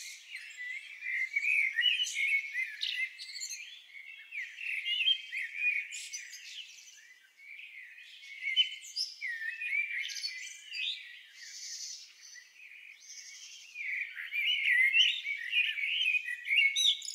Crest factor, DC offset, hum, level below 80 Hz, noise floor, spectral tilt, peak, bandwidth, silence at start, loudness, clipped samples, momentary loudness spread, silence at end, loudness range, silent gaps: 20 dB; under 0.1%; none; under -90 dBFS; -58 dBFS; 9 dB/octave; -14 dBFS; 16 kHz; 0 s; -30 LUFS; under 0.1%; 21 LU; 0 s; 11 LU; none